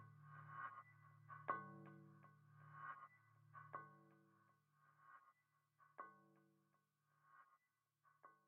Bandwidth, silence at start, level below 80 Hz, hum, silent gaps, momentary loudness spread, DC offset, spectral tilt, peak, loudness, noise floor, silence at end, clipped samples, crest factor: 3.6 kHz; 0 s; under -90 dBFS; none; none; 18 LU; under 0.1%; -1 dB/octave; -30 dBFS; -57 LUFS; -88 dBFS; 0 s; under 0.1%; 32 dB